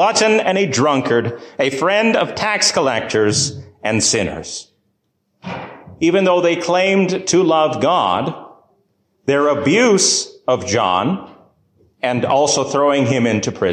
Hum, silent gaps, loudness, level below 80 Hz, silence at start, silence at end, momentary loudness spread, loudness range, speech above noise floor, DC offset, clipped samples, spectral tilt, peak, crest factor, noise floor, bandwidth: none; none; -16 LUFS; -50 dBFS; 0 s; 0 s; 12 LU; 3 LU; 52 dB; under 0.1%; under 0.1%; -3.5 dB/octave; -2 dBFS; 14 dB; -68 dBFS; 14 kHz